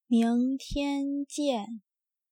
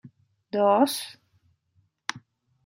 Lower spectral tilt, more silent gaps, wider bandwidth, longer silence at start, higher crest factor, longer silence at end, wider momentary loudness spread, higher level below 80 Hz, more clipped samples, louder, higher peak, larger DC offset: about the same, -5 dB/octave vs -4 dB/octave; neither; second, 13 kHz vs 16 kHz; about the same, 0.1 s vs 0.05 s; second, 14 dB vs 22 dB; about the same, 0.5 s vs 0.5 s; second, 12 LU vs 15 LU; first, -50 dBFS vs -80 dBFS; neither; second, -29 LUFS vs -25 LUFS; second, -16 dBFS vs -6 dBFS; neither